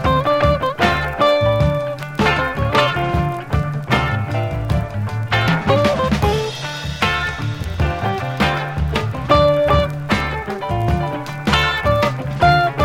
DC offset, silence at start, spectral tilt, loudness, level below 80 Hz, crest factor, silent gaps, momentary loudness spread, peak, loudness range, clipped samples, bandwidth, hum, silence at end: under 0.1%; 0 s; -6 dB/octave; -18 LUFS; -30 dBFS; 16 dB; none; 8 LU; 0 dBFS; 2 LU; under 0.1%; 16.5 kHz; none; 0 s